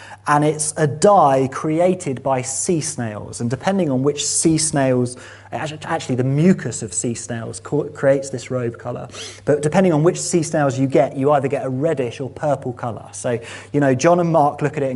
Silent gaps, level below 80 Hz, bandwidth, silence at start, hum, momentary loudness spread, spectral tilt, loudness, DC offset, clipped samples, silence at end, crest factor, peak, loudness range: none; -56 dBFS; 11.5 kHz; 0 s; none; 12 LU; -5.5 dB/octave; -19 LUFS; under 0.1%; under 0.1%; 0 s; 18 dB; -2 dBFS; 3 LU